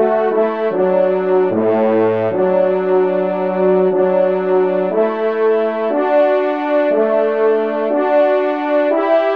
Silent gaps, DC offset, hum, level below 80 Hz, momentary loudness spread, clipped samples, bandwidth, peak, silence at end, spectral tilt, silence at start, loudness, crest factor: none; 0.4%; none; -68 dBFS; 3 LU; under 0.1%; 5.2 kHz; -2 dBFS; 0 s; -9 dB/octave; 0 s; -15 LUFS; 12 dB